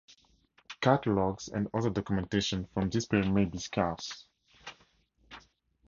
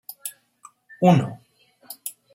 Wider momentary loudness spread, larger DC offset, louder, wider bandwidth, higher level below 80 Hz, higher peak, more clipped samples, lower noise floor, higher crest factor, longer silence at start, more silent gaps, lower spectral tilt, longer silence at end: first, 22 LU vs 18 LU; neither; second, -31 LUFS vs -21 LUFS; second, 7.6 kHz vs 16.5 kHz; first, -54 dBFS vs -66 dBFS; second, -8 dBFS vs -2 dBFS; neither; first, -67 dBFS vs -53 dBFS; about the same, 24 dB vs 22 dB; first, 0.7 s vs 0.25 s; neither; about the same, -5.5 dB/octave vs -6.5 dB/octave; first, 0.5 s vs 0.25 s